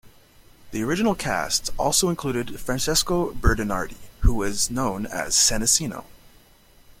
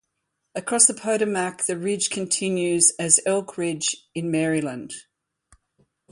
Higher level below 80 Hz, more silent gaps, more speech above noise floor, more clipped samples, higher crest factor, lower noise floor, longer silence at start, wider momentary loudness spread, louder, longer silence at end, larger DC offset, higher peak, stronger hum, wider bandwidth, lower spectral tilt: first, -32 dBFS vs -68 dBFS; neither; second, 31 dB vs 55 dB; neither; about the same, 20 dB vs 22 dB; second, -53 dBFS vs -78 dBFS; second, 0.05 s vs 0.55 s; second, 11 LU vs 15 LU; about the same, -23 LUFS vs -21 LUFS; second, 0.7 s vs 1.1 s; neither; about the same, -4 dBFS vs -2 dBFS; neither; first, 16.5 kHz vs 11.5 kHz; about the same, -3 dB/octave vs -3 dB/octave